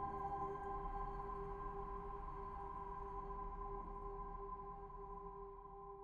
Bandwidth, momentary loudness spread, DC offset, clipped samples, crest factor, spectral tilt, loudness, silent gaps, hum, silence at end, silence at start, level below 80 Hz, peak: 6.8 kHz; 8 LU; under 0.1%; under 0.1%; 14 dB; -8.5 dB/octave; -49 LUFS; none; none; 0 s; 0 s; -54 dBFS; -34 dBFS